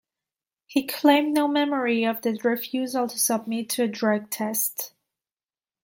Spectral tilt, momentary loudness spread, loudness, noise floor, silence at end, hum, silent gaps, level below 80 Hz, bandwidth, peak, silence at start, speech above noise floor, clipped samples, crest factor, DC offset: -3 dB/octave; 7 LU; -24 LUFS; under -90 dBFS; 0.95 s; none; none; -76 dBFS; 17 kHz; -4 dBFS; 0.7 s; over 66 dB; under 0.1%; 20 dB; under 0.1%